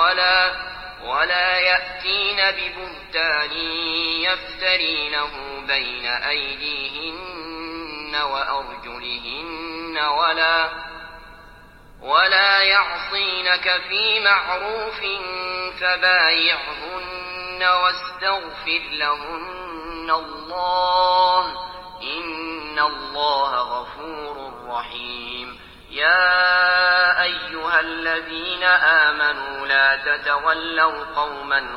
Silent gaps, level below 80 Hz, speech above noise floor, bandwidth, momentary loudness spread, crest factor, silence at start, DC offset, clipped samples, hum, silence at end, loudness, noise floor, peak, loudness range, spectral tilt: none; -50 dBFS; 24 dB; 12.5 kHz; 16 LU; 20 dB; 0 s; under 0.1%; under 0.1%; none; 0 s; -19 LUFS; -45 dBFS; -2 dBFS; 7 LU; -3.5 dB/octave